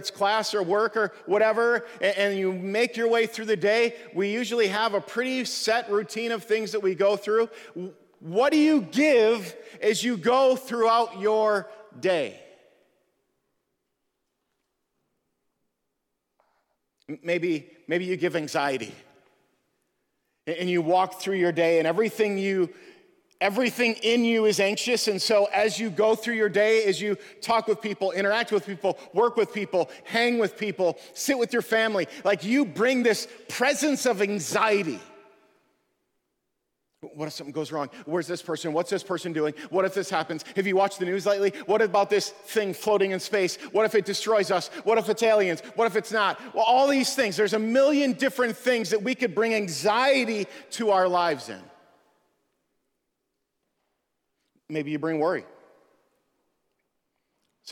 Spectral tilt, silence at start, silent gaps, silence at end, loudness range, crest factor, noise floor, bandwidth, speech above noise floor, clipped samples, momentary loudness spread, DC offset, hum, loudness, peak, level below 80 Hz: -4 dB/octave; 0 s; none; 0 s; 10 LU; 18 dB; -80 dBFS; 18 kHz; 55 dB; under 0.1%; 9 LU; under 0.1%; none; -25 LUFS; -8 dBFS; -76 dBFS